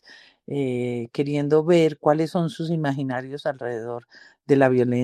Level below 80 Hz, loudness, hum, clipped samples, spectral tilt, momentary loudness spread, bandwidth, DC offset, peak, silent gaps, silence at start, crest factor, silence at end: -68 dBFS; -23 LUFS; none; under 0.1%; -7.5 dB/octave; 12 LU; 12.5 kHz; under 0.1%; -4 dBFS; none; 0.5 s; 18 dB; 0 s